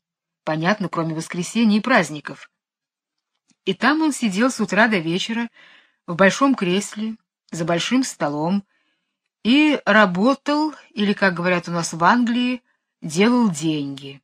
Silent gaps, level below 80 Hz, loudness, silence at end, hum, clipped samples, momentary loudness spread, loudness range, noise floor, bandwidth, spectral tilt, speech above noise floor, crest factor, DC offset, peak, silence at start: none; -68 dBFS; -20 LUFS; 0.05 s; none; under 0.1%; 13 LU; 4 LU; -88 dBFS; 14 kHz; -4.5 dB/octave; 69 dB; 20 dB; under 0.1%; -2 dBFS; 0.45 s